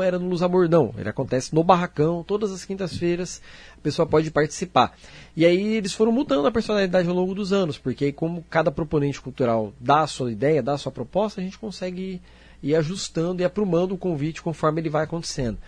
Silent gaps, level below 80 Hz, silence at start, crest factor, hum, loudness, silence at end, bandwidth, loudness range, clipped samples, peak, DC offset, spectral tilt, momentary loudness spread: none; -48 dBFS; 0 s; 20 dB; none; -23 LUFS; 0 s; 10.5 kHz; 4 LU; under 0.1%; -2 dBFS; under 0.1%; -6 dB/octave; 10 LU